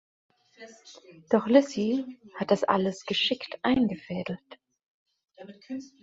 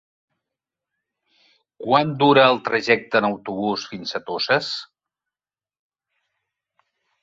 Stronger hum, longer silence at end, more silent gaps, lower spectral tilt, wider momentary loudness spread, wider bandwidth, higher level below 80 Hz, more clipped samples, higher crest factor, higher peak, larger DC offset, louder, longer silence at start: neither; second, 0.15 s vs 2.4 s; first, 4.86-5.06 s vs none; about the same, -5.5 dB/octave vs -5 dB/octave; first, 18 LU vs 14 LU; about the same, 8 kHz vs 7.8 kHz; about the same, -64 dBFS vs -66 dBFS; neither; about the same, 24 dB vs 22 dB; second, -6 dBFS vs 0 dBFS; neither; second, -27 LUFS vs -20 LUFS; second, 0.6 s vs 1.8 s